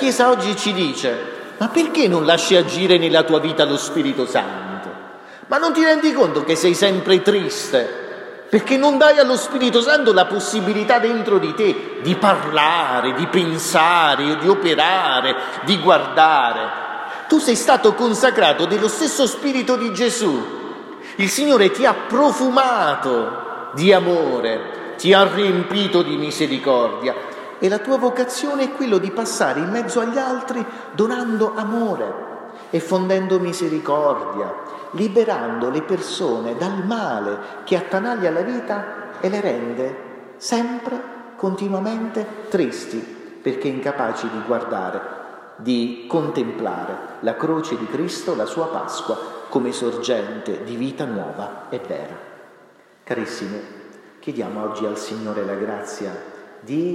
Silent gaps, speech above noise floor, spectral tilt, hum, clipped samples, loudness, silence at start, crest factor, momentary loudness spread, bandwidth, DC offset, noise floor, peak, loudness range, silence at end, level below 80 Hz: none; 32 dB; -4 dB/octave; none; under 0.1%; -19 LUFS; 0 s; 18 dB; 15 LU; 14.5 kHz; under 0.1%; -50 dBFS; 0 dBFS; 9 LU; 0 s; -72 dBFS